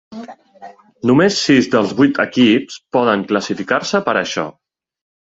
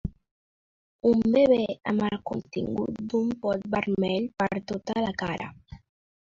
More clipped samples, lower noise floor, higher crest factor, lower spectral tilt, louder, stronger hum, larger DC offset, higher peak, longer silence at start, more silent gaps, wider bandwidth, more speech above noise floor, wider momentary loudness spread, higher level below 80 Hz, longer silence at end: neither; second, -40 dBFS vs under -90 dBFS; about the same, 16 dB vs 16 dB; second, -5 dB/octave vs -7 dB/octave; first, -15 LUFS vs -27 LUFS; neither; neither; first, 0 dBFS vs -10 dBFS; about the same, 0.1 s vs 0.05 s; second, none vs 0.31-0.99 s; about the same, 7.8 kHz vs 7.4 kHz; second, 25 dB vs over 64 dB; about the same, 9 LU vs 11 LU; about the same, -56 dBFS vs -52 dBFS; first, 0.8 s vs 0.45 s